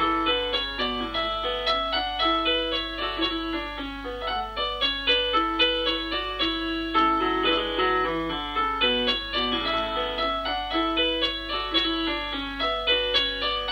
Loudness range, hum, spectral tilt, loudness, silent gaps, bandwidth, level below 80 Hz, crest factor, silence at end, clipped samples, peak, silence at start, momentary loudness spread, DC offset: 2 LU; 50 Hz at -45 dBFS; -4.5 dB/octave; -24 LUFS; none; 16 kHz; -42 dBFS; 16 dB; 0 s; under 0.1%; -10 dBFS; 0 s; 7 LU; under 0.1%